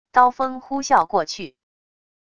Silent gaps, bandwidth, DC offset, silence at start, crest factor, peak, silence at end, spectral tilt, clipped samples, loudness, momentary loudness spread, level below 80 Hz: none; 10 kHz; under 0.1%; 0.15 s; 20 dB; -2 dBFS; 0.8 s; -3 dB/octave; under 0.1%; -20 LUFS; 14 LU; -60 dBFS